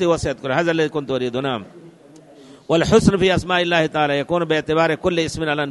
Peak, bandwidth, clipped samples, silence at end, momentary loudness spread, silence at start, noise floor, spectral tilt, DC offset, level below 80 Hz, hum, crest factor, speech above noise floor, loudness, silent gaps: 0 dBFS; 11.5 kHz; under 0.1%; 0 s; 8 LU; 0 s; -45 dBFS; -5.5 dB/octave; under 0.1%; -42 dBFS; none; 20 dB; 27 dB; -19 LUFS; none